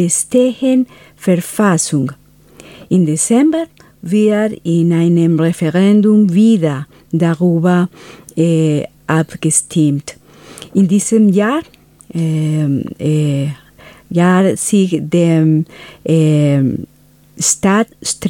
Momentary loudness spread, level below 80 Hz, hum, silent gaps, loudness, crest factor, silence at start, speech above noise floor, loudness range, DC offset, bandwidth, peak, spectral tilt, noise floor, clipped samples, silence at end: 11 LU; -52 dBFS; none; none; -13 LUFS; 14 dB; 0 s; 28 dB; 3 LU; under 0.1%; 16.5 kHz; 0 dBFS; -6 dB/octave; -41 dBFS; under 0.1%; 0 s